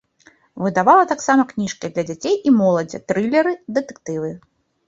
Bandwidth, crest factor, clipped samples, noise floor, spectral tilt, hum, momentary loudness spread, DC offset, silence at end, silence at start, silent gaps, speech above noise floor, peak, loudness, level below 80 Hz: 7.8 kHz; 18 dB; under 0.1%; -54 dBFS; -5.5 dB/octave; none; 13 LU; under 0.1%; 0.5 s; 0.55 s; none; 36 dB; -2 dBFS; -18 LUFS; -62 dBFS